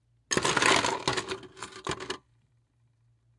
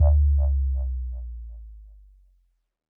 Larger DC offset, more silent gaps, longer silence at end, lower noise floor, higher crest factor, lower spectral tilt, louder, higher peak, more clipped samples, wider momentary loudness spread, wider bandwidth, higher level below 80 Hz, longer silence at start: neither; neither; about the same, 1.2 s vs 1.1 s; about the same, -68 dBFS vs -66 dBFS; first, 24 dB vs 14 dB; second, -2 dB/octave vs -13.5 dB/octave; second, -28 LUFS vs -25 LUFS; first, -6 dBFS vs -10 dBFS; neither; second, 17 LU vs 23 LU; first, 11.5 kHz vs 1.2 kHz; second, -60 dBFS vs -24 dBFS; first, 0.3 s vs 0 s